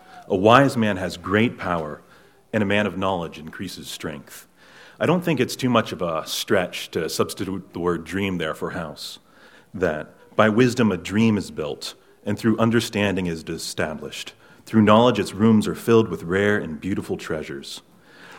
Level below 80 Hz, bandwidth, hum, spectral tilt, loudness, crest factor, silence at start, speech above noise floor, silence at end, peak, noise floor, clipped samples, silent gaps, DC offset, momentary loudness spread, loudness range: -54 dBFS; 16.5 kHz; none; -5.5 dB/octave; -22 LUFS; 22 dB; 0.1 s; 30 dB; 0 s; 0 dBFS; -51 dBFS; under 0.1%; none; under 0.1%; 16 LU; 7 LU